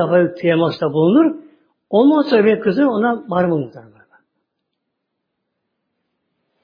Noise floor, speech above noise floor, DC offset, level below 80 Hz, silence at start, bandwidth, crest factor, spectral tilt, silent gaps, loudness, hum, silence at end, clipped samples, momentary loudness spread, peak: -75 dBFS; 60 dB; under 0.1%; -64 dBFS; 0 s; 5.2 kHz; 16 dB; -9.5 dB/octave; none; -16 LUFS; none; 2.85 s; under 0.1%; 6 LU; -2 dBFS